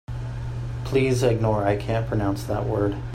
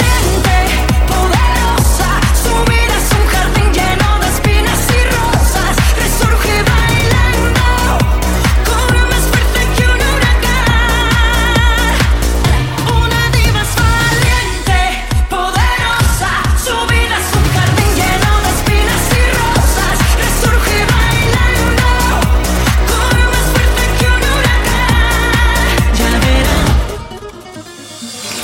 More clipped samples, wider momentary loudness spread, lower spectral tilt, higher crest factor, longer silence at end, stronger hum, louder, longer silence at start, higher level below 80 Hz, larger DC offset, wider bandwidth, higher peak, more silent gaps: neither; first, 10 LU vs 2 LU; first, -7 dB/octave vs -4 dB/octave; first, 16 dB vs 10 dB; about the same, 0 s vs 0 s; neither; second, -24 LUFS vs -12 LUFS; about the same, 0.1 s vs 0 s; second, -38 dBFS vs -14 dBFS; neither; second, 15 kHz vs 17 kHz; second, -8 dBFS vs 0 dBFS; neither